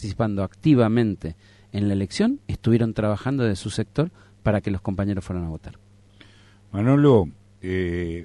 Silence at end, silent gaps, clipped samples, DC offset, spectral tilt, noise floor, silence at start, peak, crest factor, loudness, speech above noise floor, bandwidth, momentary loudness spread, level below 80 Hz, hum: 0 s; none; under 0.1%; under 0.1%; -7.5 dB/octave; -51 dBFS; 0 s; -6 dBFS; 18 dB; -23 LUFS; 29 dB; 11 kHz; 14 LU; -44 dBFS; none